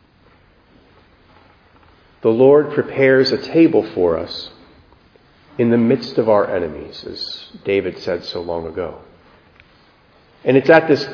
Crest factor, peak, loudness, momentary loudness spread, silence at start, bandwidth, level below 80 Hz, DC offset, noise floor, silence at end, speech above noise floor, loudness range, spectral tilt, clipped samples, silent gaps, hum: 18 dB; 0 dBFS; -16 LUFS; 16 LU; 2.2 s; 5.4 kHz; -52 dBFS; under 0.1%; -52 dBFS; 0 s; 36 dB; 9 LU; -7 dB/octave; under 0.1%; none; none